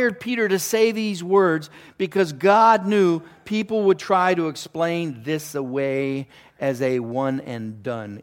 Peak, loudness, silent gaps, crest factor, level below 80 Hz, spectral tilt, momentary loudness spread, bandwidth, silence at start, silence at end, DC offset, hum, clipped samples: -4 dBFS; -21 LUFS; none; 18 dB; -68 dBFS; -5 dB/octave; 12 LU; 17 kHz; 0 s; 0 s; under 0.1%; none; under 0.1%